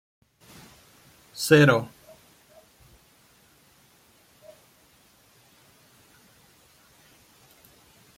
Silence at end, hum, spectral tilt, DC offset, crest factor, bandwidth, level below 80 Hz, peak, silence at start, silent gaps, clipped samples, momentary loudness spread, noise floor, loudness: 6.3 s; none; -5.5 dB/octave; under 0.1%; 26 dB; 16.5 kHz; -66 dBFS; -4 dBFS; 1.35 s; none; under 0.1%; 32 LU; -59 dBFS; -20 LUFS